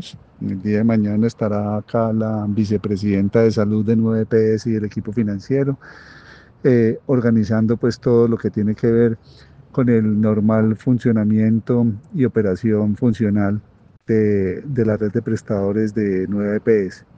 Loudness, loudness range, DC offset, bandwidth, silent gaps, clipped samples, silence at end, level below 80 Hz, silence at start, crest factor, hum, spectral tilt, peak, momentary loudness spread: -18 LUFS; 2 LU; under 0.1%; 7.6 kHz; none; under 0.1%; 0.2 s; -52 dBFS; 0 s; 16 dB; none; -9 dB/octave; -2 dBFS; 6 LU